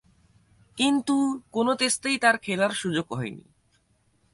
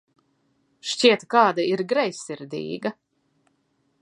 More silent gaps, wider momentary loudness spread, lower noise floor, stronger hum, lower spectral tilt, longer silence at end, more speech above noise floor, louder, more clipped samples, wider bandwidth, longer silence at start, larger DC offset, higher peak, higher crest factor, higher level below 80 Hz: neither; second, 11 LU vs 14 LU; about the same, -66 dBFS vs -69 dBFS; neither; about the same, -3.5 dB/octave vs -3.5 dB/octave; second, 0.95 s vs 1.1 s; second, 42 dB vs 47 dB; second, -25 LUFS vs -22 LUFS; neither; about the same, 11.5 kHz vs 11.5 kHz; about the same, 0.75 s vs 0.85 s; neither; second, -6 dBFS vs -2 dBFS; about the same, 20 dB vs 22 dB; first, -66 dBFS vs -76 dBFS